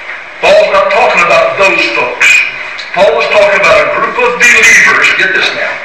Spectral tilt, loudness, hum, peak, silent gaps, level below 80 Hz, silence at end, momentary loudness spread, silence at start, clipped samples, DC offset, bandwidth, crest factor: -1.5 dB/octave; -6 LUFS; none; 0 dBFS; none; -44 dBFS; 0 s; 8 LU; 0 s; 0.5%; 0.7%; 16 kHz; 8 dB